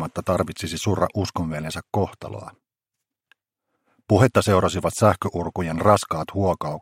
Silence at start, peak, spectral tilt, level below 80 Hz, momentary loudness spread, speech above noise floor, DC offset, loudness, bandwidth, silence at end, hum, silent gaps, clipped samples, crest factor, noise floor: 0 s; -2 dBFS; -6 dB/octave; -48 dBFS; 10 LU; 63 dB; under 0.1%; -22 LUFS; 16.5 kHz; 0 s; none; none; under 0.1%; 22 dB; -85 dBFS